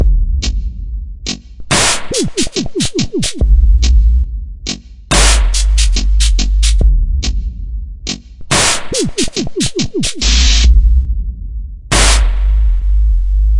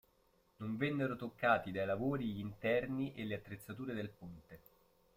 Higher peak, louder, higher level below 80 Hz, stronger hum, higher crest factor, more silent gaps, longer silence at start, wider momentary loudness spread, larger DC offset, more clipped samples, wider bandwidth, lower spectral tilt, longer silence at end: first, 0 dBFS vs -18 dBFS; first, -14 LUFS vs -39 LUFS; first, -12 dBFS vs -68 dBFS; neither; second, 12 dB vs 22 dB; neither; second, 0 s vs 0.6 s; about the same, 14 LU vs 15 LU; neither; neither; second, 11.5 kHz vs 16 kHz; second, -3.5 dB/octave vs -7.5 dB/octave; second, 0 s vs 0.6 s